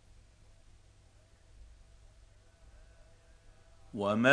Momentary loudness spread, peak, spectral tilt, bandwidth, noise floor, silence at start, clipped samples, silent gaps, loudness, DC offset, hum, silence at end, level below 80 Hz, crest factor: 29 LU; -8 dBFS; -5.5 dB/octave; 10.5 kHz; -62 dBFS; 1.6 s; under 0.1%; none; -33 LUFS; under 0.1%; none; 0 s; -60 dBFS; 28 dB